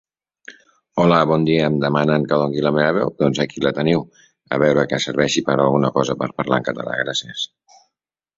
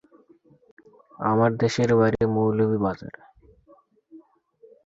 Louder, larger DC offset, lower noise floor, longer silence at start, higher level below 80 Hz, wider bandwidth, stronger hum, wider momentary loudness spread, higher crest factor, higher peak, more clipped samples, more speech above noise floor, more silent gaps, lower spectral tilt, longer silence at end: first, -19 LUFS vs -22 LUFS; neither; first, -81 dBFS vs -58 dBFS; second, 0.5 s vs 1.2 s; about the same, -54 dBFS vs -54 dBFS; about the same, 7.8 kHz vs 7.8 kHz; neither; about the same, 7 LU vs 9 LU; about the same, 18 dB vs 18 dB; first, -2 dBFS vs -8 dBFS; neither; first, 63 dB vs 36 dB; neither; second, -5.5 dB/octave vs -7 dB/octave; first, 0.9 s vs 0.65 s